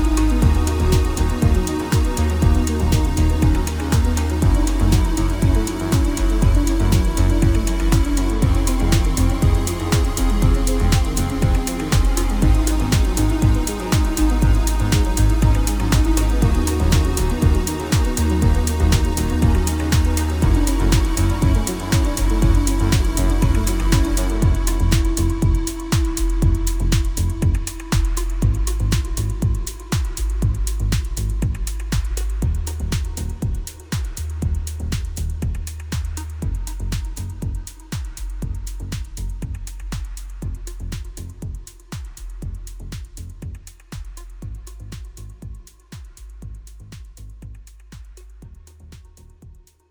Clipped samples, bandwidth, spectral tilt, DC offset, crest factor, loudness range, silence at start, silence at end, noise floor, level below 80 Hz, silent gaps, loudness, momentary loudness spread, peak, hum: under 0.1%; over 20 kHz; -5.5 dB/octave; under 0.1%; 18 dB; 17 LU; 0 s; 0.4 s; -45 dBFS; -20 dBFS; none; -20 LUFS; 17 LU; 0 dBFS; none